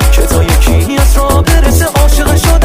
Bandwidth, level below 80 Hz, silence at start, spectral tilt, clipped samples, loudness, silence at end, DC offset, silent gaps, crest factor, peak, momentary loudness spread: 16.5 kHz; -8 dBFS; 0 s; -5 dB/octave; 0.5%; -9 LUFS; 0 s; under 0.1%; none; 6 dB; 0 dBFS; 1 LU